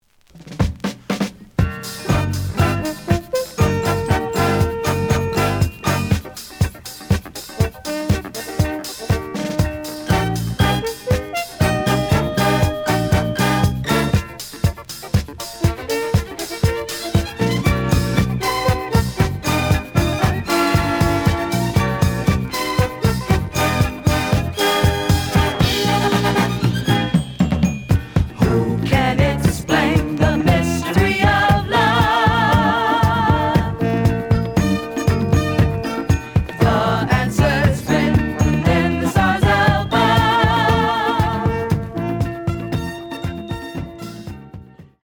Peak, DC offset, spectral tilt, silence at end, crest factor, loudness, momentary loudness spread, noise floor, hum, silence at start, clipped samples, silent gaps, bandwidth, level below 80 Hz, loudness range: 0 dBFS; under 0.1%; -5.5 dB/octave; 0.2 s; 18 dB; -18 LUFS; 8 LU; -43 dBFS; none; 0.35 s; under 0.1%; none; over 20 kHz; -32 dBFS; 6 LU